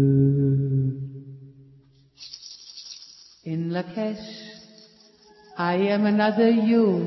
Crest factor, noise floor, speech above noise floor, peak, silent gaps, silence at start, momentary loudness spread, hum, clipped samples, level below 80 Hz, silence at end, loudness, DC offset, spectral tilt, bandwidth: 16 dB; -55 dBFS; 34 dB; -8 dBFS; none; 0 s; 22 LU; none; under 0.1%; -58 dBFS; 0 s; -23 LUFS; under 0.1%; -8 dB/octave; 6 kHz